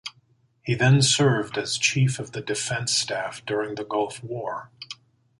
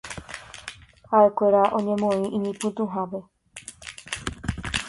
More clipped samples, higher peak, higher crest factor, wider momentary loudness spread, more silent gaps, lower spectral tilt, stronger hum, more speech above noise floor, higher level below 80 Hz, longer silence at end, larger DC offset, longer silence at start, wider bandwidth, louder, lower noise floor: neither; about the same, -8 dBFS vs -6 dBFS; about the same, 18 dB vs 20 dB; about the same, 20 LU vs 20 LU; neither; about the same, -4 dB/octave vs -5 dB/octave; neither; first, 39 dB vs 23 dB; second, -60 dBFS vs -48 dBFS; first, 0.45 s vs 0 s; neither; about the same, 0.05 s vs 0.05 s; about the same, 11.5 kHz vs 11.5 kHz; about the same, -23 LUFS vs -23 LUFS; first, -63 dBFS vs -45 dBFS